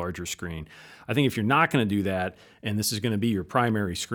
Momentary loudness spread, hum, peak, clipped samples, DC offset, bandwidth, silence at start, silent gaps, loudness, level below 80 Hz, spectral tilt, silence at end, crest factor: 14 LU; none; -6 dBFS; under 0.1%; under 0.1%; over 20 kHz; 0 s; none; -26 LUFS; -58 dBFS; -5 dB/octave; 0 s; 20 dB